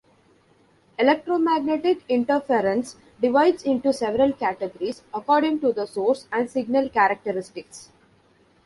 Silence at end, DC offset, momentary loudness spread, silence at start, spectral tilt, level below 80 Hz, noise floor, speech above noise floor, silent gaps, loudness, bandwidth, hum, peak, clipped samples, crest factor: 0.85 s; under 0.1%; 11 LU; 1 s; -5 dB/octave; -62 dBFS; -59 dBFS; 37 dB; none; -22 LUFS; 11.5 kHz; none; -4 dBFS; under 0.1%; 18 dB